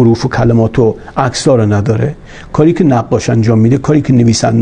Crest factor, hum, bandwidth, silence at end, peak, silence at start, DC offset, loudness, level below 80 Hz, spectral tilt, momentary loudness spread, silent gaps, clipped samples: 10 dB; none; 9.8 kHz; 0 s; 0 dBFS; 0 s; under 0.1%; -11 LUFS; -34 dBFS; -6.5 dB/octave; 6 LU; none; 0.2%